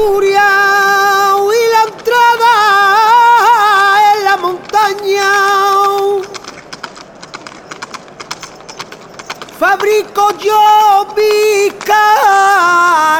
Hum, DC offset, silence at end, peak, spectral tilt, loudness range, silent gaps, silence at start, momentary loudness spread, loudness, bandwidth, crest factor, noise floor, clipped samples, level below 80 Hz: none; under 0.1%; 0 s; 0 dBFS; -1.5 dB/octave; 12 LU; none; 0 s; 21 LU; -9 LUFS; 18.5 kHz; 10 dB; -32 dBFS; under 0.1%; -50 dBFS